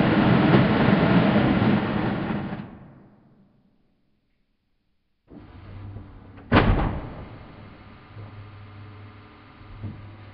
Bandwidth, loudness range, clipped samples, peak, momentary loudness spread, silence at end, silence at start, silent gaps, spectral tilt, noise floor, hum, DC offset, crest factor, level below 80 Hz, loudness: 5.4 kHz; 21 LU; under 0.1%; -4 dBFS; 25 LU; 0 s; 0 s; none; -6 dB/octave; -70 dBFS; none; under 0.1%; 20 dB; -38 dBFS; -21 LUFS